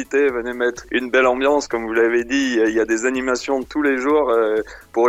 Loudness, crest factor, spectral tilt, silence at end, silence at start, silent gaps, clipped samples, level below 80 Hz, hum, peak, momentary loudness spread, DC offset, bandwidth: -19 LUFS; 14 dB; -3.5 dB/octave; 0 s; 0 s; none; under 0.1%; -48 dBFS; none; -4 dBFS; 6 LU; under 0.1%; 14 kHz